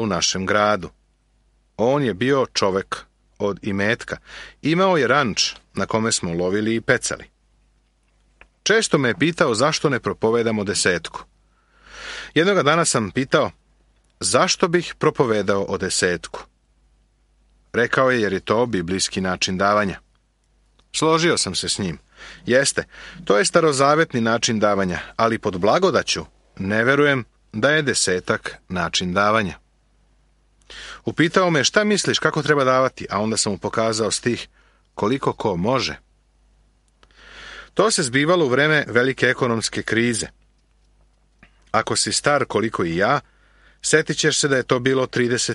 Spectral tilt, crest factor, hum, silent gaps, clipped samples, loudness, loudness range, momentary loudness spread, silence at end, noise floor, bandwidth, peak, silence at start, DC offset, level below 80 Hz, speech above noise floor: -3.5 dB/octave; 20 dB; none; none; under 0.1%; -20 LUFS; 4 LU; 11 LU; 0 s; -62 dBFS; 11.5 kHz; -2 dBFS; 0 s; under 0.1%; -52 dBFS; 42 dB